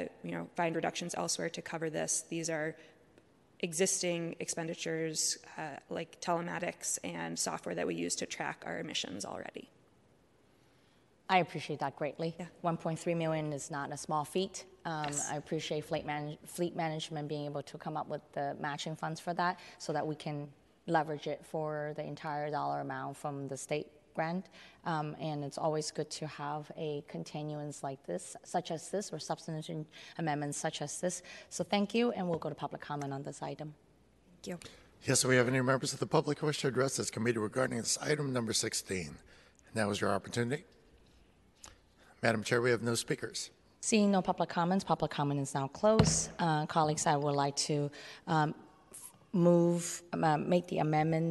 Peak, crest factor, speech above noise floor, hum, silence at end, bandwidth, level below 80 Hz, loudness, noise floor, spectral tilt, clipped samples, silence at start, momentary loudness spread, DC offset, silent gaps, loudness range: -12 dBFS; 24 dB; 33 dB; none; 0 s; 12 kHz; -64 dBFS; -35 LUFS; -67 dBFS; -4.5 dB/octave; under 0.1%; 0 s; 12 LU; under 0.1%; none; 7 LU